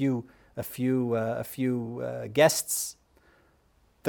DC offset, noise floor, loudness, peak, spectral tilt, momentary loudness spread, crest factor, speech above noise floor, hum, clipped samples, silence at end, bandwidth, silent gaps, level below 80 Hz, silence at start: under 0.1%; -65 dBFS; -28 LUFS; -8 dBFS; -4.5 dB/octave; 14 LU; 22 dB; 37 dB; none; under 0.1%; 0 s; over 20 kHz; none; -66 dBFS; 0 s